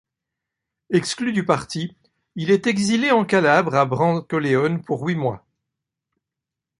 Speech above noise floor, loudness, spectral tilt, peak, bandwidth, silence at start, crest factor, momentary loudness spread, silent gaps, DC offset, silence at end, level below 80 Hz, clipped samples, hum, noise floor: 66 dB; -20 LUFS; -5.5 dB/octave; -2 dBFS; 11.5 kHz; 0.9 s; 20 dB; 12 LU; none; under 0.1%; 1.4 s; -60 dBFS; under 0.1%; none; -85 dBFS